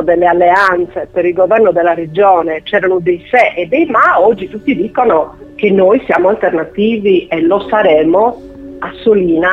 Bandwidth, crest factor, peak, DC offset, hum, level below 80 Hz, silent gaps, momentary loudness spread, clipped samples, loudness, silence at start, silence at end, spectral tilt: 7.6 kHz; 10 dB; 0 dBFS; under 0.1%; none; -44 dBFS; none; 8 LU; under 0.1%; -11 LUFS; 0 s; 0 s; -7.5 dB/octave